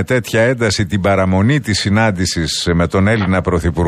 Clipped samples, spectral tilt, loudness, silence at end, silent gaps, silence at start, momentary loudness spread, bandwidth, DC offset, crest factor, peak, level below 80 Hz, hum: under 0.1%; -5.5 dB/octave; -14 LUFS; 0 s; none; 0 s; 3 LU; 14.5 kHz; under 0.1%; 12 dB; -2 dBFS; -32 dBFS; none